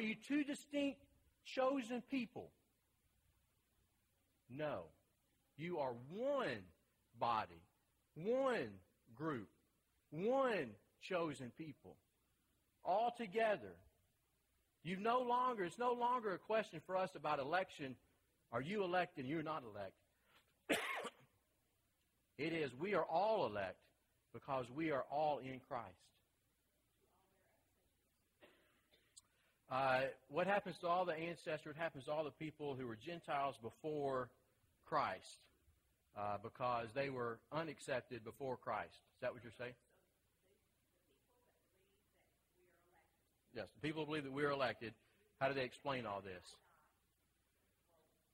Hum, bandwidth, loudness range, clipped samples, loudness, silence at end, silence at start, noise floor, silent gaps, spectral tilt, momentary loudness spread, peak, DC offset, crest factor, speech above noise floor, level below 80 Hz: none; 16 kHz; 9 LU; under 0.1%; -43 LUFS; 1.8 s; 0 s; -83 dBFS; none; -5.5 dB/octave; 15 LU; -24 dBFS; under 0.1%; 20 dB; 40 dB; -80 dBFS